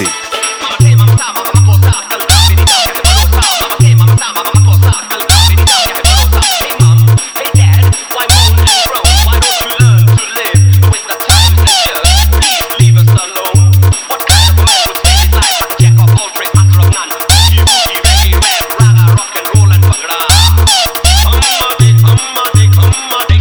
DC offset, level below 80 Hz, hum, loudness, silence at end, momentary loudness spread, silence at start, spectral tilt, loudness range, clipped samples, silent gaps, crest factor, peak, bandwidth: 0.1%; -14 dBFS; none; -7 LUFS; 0 s; 5 LU; 0 s; -3.5 dB/octave; 0 LU; under 0.1%; none; 6 dB; 0 dBFS; over 20 kHz